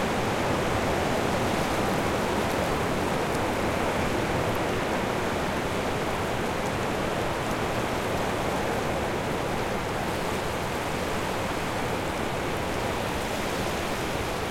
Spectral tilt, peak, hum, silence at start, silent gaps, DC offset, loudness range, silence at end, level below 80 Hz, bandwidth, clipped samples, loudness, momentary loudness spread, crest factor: -4.5 dB/octave; -12 dBFS; none; 0 s; none; under 0.1%; 3 LU; 0 s; -42 dBFS; 16.5 kHz; under 0.1%; -28 LUFS; 3 LU; 14 dB